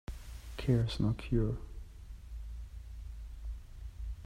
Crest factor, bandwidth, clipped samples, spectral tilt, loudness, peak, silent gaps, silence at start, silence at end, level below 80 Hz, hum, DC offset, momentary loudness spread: 20 dB; 13.5 kHz; under 0.1%; -7.5 dB/octave; -36 LUFS; -16 dBFS; none; 0.1 s; 0 s; -44 dBFS; none; under 0.1%; 19 LU